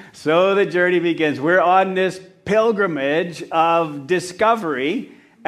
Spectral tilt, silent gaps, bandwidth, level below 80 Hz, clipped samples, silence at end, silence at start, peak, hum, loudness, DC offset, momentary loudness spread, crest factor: -5.5 dB/octave; none; 13 kHz; -62 dBFS; under 0.1%; 0.45 s; 0 s; -2 dBFS; none; -18 LUFS; under 0.1%; 7 LU; 16 dB